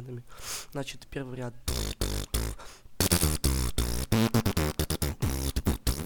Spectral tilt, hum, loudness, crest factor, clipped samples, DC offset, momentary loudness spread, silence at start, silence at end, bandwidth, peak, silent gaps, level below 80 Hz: -4.5 dB/octave; none; -30 LUFS; 22 dB; under 0.1%; under 0.1%; 13 LU; 0 s; 0 s; over 20 kHz; -6 dBFS; none; -36 dBFS